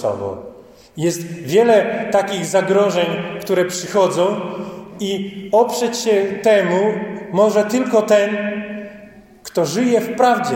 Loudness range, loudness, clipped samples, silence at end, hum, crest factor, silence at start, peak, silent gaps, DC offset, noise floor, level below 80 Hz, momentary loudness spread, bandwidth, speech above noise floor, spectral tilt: 2 LU; -17 LUFS; under 0.1%; 0 s; none; 16 dB; 0 s; -2 dBFS; none; under 0.1%; -41 dBFS; -60 dBFS; 13 LU; 17 kHz; 25 dB; -4.5 dB/octave